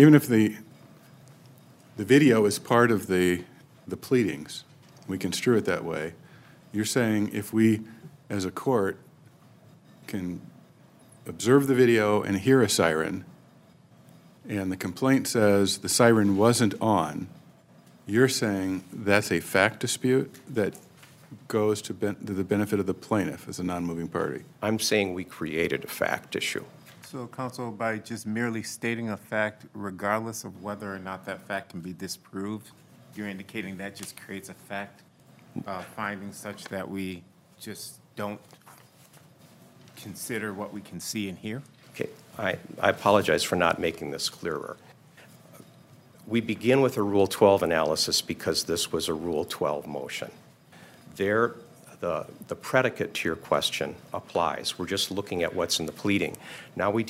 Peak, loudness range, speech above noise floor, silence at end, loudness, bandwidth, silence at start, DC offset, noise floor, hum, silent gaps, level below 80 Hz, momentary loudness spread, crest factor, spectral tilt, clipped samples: -4 dBFS; 13 LU; 29 dB; 0 s; -27 LUFS; 16 kHz; 0 s; under 0.1%; -55 dBFS; none; none; -64 dBFS; 17 LU; 24 dB; -4.5 dB/octave; under 0.1%